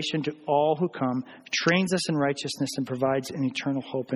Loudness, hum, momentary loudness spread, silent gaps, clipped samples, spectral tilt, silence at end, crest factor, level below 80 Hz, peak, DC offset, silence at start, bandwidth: -27 LUFS; none; 6 LU; none; under 0.1%; -5 dB/octave; 0 s; 20 dB; -68 dBFS; -6 dBFS; under 0.1%; 0 s; 13 kHz